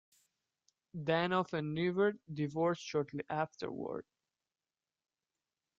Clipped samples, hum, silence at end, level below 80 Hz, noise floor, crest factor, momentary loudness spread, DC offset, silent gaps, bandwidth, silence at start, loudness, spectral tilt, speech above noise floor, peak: under 0.1%; none; 1.75 s; -76 dBFS; under -90 dBFS; 20 dB; 10 LU; under 0.1%; none; 8 kHz; 0.95 s; -36 LUFS; -6.5 dB/octave; over 55 dB; -18 dBFS